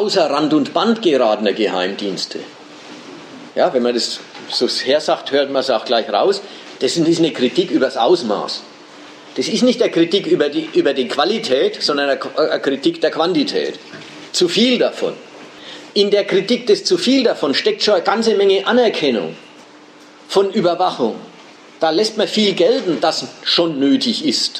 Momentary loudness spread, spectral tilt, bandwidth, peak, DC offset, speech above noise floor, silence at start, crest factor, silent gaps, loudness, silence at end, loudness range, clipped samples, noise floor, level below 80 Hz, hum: 13 LU; -4 dB/octave; 13 kHz; -2 dBFS; under 0.1%; 26 dB; 0 s; 16 dB; none; -16 LUFS; 0 s; 4 LU; under 0.1%; -42 dBFS; -72 dBFS; none